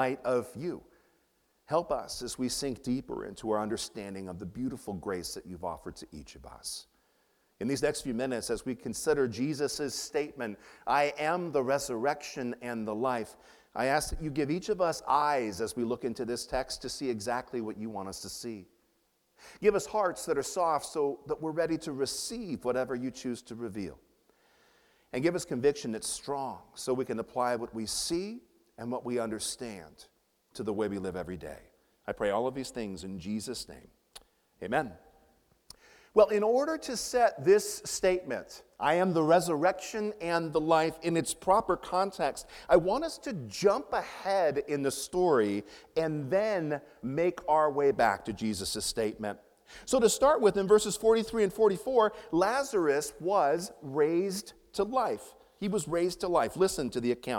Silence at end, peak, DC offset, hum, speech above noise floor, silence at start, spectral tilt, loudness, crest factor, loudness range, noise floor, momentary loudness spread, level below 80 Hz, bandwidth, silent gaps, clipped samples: 0 s; -8 dBFS; under 0.1%; none; 43 dB; 0 s; -4.5 dB/octave; -31 LUFS; 22 dB; 9 LU; -73 dBFS; 14 LU; -58 dBFS; 17.5 kHz; none; under 0.1%